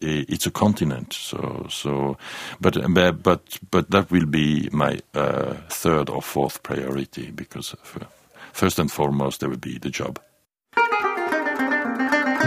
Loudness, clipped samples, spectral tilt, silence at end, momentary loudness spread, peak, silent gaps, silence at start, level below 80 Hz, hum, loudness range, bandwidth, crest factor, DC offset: -23 LUFS; under 0.1%; -5 dB/octave; 0 s; 14 LU; -2 dBFS; none; 0 s; -50 dBFS; none; 6 LU; 15.5 kHz; 22 dB; under 0.1%